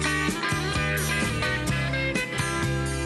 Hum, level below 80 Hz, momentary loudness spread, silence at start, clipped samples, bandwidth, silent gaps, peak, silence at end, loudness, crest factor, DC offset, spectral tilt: none; -38 dBFS; 2 LU; 0 s; under 0.1%; 12.5 kHz; none; -14 dBFS; 0 s; -25 LUFS; 12 dB; under 0.1%; -4 dB/octave